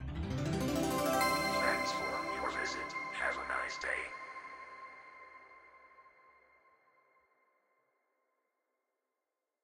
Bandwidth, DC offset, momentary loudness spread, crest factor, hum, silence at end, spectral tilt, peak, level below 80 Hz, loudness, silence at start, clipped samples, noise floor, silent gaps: 16 kHz; under 0.1%; 21 LU; 20 dB; none; 3.55 s; -4 dB/octave; -18 dBFS; -56 dBFS; -35 LUFS; 0 s; under 0.1%; -89 dBFS; none